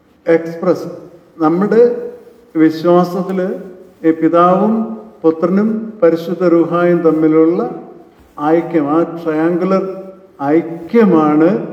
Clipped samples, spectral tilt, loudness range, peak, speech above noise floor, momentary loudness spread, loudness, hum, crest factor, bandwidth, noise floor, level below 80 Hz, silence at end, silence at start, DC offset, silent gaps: under 0.1%; -9 dB/octave; 2 LU; 0 dBFS; 27 dB; 12 LU; -14 LUFS; none; 14 dB; 7 kHz; -40 dBFS; -62 dBFS; 0 s; 0.25 s; under 0.1%; none